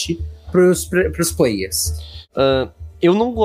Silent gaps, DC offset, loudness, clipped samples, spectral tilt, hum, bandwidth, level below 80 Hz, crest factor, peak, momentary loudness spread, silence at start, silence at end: none; under 0.1%; -18 LUFS; under 0.1%; -4.5 dB/octave; none; 16 kHz; -34 dBFS; 14 dB; -2 dBFS; 12 LU; 0 s; 0 s